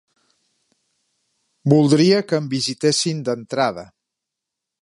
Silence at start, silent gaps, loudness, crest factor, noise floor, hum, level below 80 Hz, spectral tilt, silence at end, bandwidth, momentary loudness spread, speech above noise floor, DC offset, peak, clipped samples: 1.65 s; none; -18 LUFS; 20 dB; -83 dBFS; none; -64 dBFS; -5 dB/octave; 1 s; 11.5 kHz; 10 LU; 66 dB; under 0.1%; -2 dBFS; under 0.1%